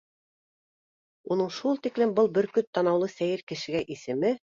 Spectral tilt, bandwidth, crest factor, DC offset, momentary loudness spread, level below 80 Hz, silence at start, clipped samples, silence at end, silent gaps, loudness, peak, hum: -6 dB/octave; 7.6 kHz; 16 dB; under 0.1%; 7 LU; -70 dBFS; 1.25 s; under 0.1%; 0.25 s; 2.67-2.73 s, 3.43-3.47 s; -27 LUFS; -12 dBFS; none